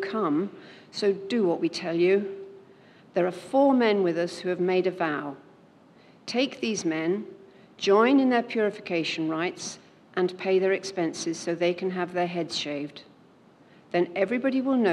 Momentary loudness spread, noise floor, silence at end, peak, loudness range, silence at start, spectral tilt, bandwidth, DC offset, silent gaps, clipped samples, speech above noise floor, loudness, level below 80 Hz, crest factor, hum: 14 LU; -56 dBFS; 0 s; -8 dBFS; 4 LU; 0 s; -5 dB/octave; 11 kHz; under 0.1%; none; under 0.1%; 30 dB; -26 LUFS; -80 dBFS; 18 dB; none